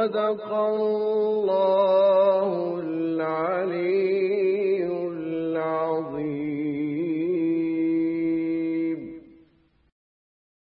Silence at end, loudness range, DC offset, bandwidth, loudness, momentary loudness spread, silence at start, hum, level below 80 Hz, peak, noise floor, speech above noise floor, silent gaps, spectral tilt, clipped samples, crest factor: 1.55 s; 4 LU; under 0.1%; 5.4 kHz; -24 LUFS; 8 LU; 0 s; none; -70 dBFS; -10 dBFS; -61 dBFS; 39 dB; none; -11 dB/octave; under 0.1%; 14 dB